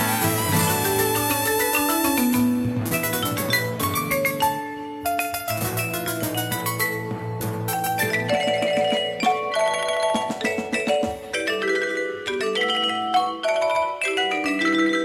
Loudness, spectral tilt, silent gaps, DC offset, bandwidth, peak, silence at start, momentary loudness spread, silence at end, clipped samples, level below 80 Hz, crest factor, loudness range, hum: -22 LUFS; -3.5 dB/octave; none; under 0.1%; 17 kHz; -6 dBFS; 0 s; 6 LU; 0 s; under 0.1%; -54 dBFS; 16 dB; 3 LU; none